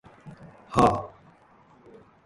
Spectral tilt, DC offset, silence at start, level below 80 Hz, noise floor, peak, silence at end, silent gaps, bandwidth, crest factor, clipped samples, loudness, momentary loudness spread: -6.5 dB/octave; under 0.1%; 0.25 s; -50 dBFS; -57 dBFS; -4 dBFS; 1.2 s; none; 11.5 kHz; 24 dB; under 0.1%; -24 LUFS; 25 LU